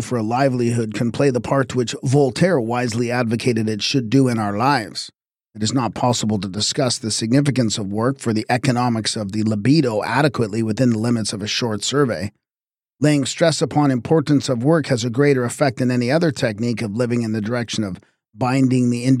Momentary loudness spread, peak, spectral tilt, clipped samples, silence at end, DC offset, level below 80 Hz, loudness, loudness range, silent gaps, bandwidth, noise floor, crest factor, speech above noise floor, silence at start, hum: 5 LU; -4 dBFS; -5.5 dB/octave; under 0.1%; 0 s; under 0.1%; -56 dBFS; -19 LUFS; 2 LU; none; 14 kHz; under -90 dBFS; 16 dB; over 72 dB; 0 s; none